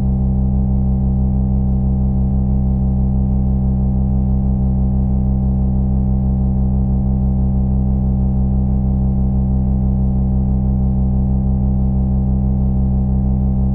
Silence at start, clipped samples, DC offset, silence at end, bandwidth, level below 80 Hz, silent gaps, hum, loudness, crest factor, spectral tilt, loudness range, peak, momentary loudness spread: 0 s; under 0.1%; under 0.1%; 0 s; 1.3 kHz; -18 dBFS; none; none; -17 LUFS; 8 dB; -15 dB/octave; 0 LU; -6 dBFS; 0 LU